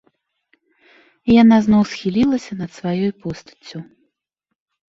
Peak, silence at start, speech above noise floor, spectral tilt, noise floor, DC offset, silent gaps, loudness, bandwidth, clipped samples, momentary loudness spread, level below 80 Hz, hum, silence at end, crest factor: -4 dBFS; 1.25 s; 62 dB; -7 dB/octave; -79 dBFS; under 0.1%; none; -16 LUFS; 7.6 kHz; under 0.1%; 23 LU; -50 dBFS; none; 1.05 s; 16 dB